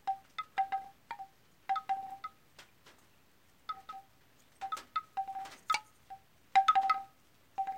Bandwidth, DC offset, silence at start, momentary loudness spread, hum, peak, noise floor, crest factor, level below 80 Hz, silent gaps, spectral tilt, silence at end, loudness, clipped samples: 16.5 kHz; under 0.1%; 0.05 s; 23 LU; none; -16 dBFS; -68 dBFS; 22 dB; -78 dBFS; none; -0.5 dB/octave; 0 s; -35 LUFS; under 0.1%